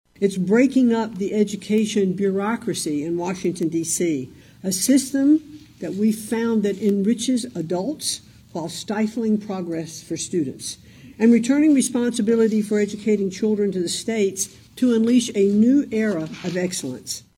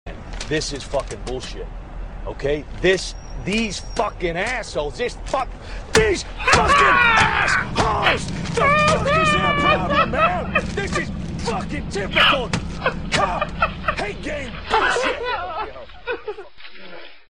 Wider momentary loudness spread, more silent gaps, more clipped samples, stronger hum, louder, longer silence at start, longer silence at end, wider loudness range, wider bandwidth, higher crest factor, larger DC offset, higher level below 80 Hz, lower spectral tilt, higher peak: second, 12 LU vs 17 LU; neither; neither; neither; about the same, -21 LUFS vs -20 LUFS; first, 0.2 s vs 0.05 s; about the same, 0.2 s vs 0.15 s; second, 4 LU vs 8 LU; first, 16.5 kHz vs 13 kHz; about the same, 16 dB vs 20 dB; neither; second, -60 dBFS vs -34 dBFS; about the same, -5 dB/octave vs -4 dB/octave; second, -6 dBFS vs 0 dBFS